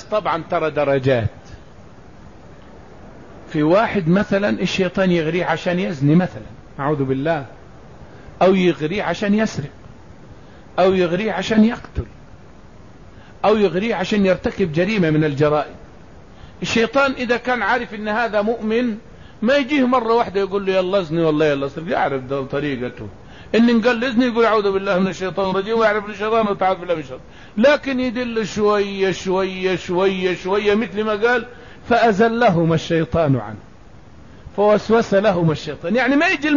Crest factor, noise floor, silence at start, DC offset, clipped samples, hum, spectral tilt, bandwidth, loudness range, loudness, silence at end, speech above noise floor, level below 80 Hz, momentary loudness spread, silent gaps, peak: 14 dB; -44 dBFS; 0 s; 0.5%; under 0.1%; none; -6.5 dB/octave; 7.4 kHz; 3 LU; -18 LUFS; 0 s; 26 dB; -46 dBFS; 9 LU; none; -4 dBFS